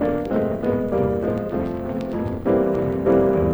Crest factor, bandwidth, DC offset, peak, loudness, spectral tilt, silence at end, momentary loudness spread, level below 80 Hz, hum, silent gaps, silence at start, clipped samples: 14 dB; over 20 kHz; under 0.1%; -6 dBFS; -22 LUFS; -9.5 dB/octave; 0 s; 8 LU; -40 dBFS; none; none; 0 s; under 0.1%